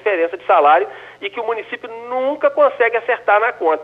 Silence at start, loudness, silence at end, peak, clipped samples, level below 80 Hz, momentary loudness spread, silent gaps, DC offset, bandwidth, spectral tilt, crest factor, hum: 0.05 s; -16 LUFS; 0 s; -2 dBFS; under 0.1%; -70 dBFS; 14 LU; none; under 0.1%; 5.2 kHz; -5 dB/octave; 14 dB; none